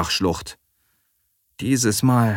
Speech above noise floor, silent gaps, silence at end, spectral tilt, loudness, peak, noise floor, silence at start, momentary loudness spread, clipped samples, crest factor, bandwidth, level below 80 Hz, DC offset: 49 dB; none; 0 s; -4.5 dB/octave; -21 LUFS; -6 dBFS; -68 dBFS; 0 s; 13 LU; under 0.1%; 16 dB; 18 kHz; -48 dBFS; under 0.1%